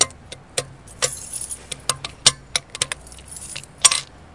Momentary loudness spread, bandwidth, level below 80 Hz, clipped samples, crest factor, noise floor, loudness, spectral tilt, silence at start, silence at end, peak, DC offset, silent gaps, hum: 18 LU; 12 kHz; -50 dBFS; under 0.1%; 24 dB; -41 dBFS; -21 LUFS; 0.5 dB/octave; 0 s; 0.2 s; 0 dBFS; 0.1%; none; none